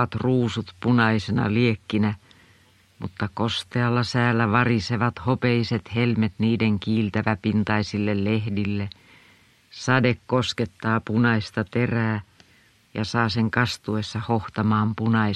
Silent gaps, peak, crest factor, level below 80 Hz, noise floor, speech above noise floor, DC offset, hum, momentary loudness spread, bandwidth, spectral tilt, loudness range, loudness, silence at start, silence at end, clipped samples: none; -2 dBFS; 20 dB; -54 dBFS; -58 dBFS; 35 dB; under 0.1%; none; 7 LU; 10.5 kHz; -6.5 dB/octave; 3 LU; -23 LUFS; 0 s; 0 s; under 0.1%